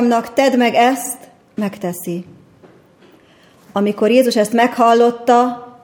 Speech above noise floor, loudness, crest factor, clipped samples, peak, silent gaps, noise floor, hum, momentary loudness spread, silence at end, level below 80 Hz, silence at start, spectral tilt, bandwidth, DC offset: 34 dB; -15 LUFS; 16 dB; under 0.1%; 0 dBFS; none; -48 dBFS; none; 13 LU; 0.15 s; -66 dBFS; 0 s; -4.5 dB/octave; 20 kHz; under 0.1%